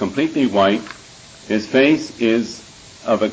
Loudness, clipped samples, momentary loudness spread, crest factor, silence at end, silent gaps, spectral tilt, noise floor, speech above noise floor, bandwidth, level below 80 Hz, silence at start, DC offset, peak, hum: -18 LUFS; under 0.1%; 17 LU; 16 dB; 0 s; none; -5 dB/octave; -42 dBFS; 25 dB; 8 kHz; -52 dBFS; 0 s; under 0.1%; -2 dBFS; none